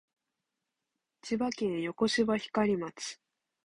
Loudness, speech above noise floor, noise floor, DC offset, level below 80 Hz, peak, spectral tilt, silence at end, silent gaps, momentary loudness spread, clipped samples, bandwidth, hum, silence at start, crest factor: -32 LUFS; 56 dB; -87 dBFS; under 0.1%; -68 dBFS; -16 dBFS; -4.5 dB/octave; 0.55 s; none; 13 LU; under 0.1%; 11.5 kHz; none; 1.25 s; 18 dB